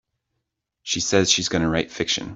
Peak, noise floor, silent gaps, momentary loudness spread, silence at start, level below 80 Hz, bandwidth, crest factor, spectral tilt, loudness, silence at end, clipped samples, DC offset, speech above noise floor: -4 dBFS; -79 dBFS; none; 8 LU; 0.85 s; -50 dBFS; 8.2 kHz; 20 dB; -3 dB/octave; -21 LUFS; 0 s; under 0.1%; under 0.1%; 57 dB